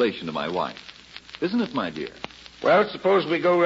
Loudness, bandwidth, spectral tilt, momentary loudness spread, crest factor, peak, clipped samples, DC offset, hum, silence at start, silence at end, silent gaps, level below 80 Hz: -24 LUFS; 7.8 kHz; -6 dB/octave; 20 LU; 16 dB; -8 dBFS; under 0.1%; under 0.1%; none; 0 s; 0 s; none; -60 dBFS